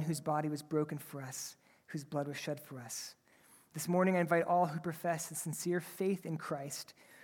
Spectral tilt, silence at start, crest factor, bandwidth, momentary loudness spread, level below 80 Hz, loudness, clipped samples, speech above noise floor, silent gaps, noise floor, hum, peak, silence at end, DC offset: -5 dB/octave; 0 s; 20 dB; 18 kHz; 14 LU; -82 dBFS; -37 LUFS; under 0.1%; 29 dB; none; -65 dBFS; none; -16 dBFS; 0 s; under 0.1%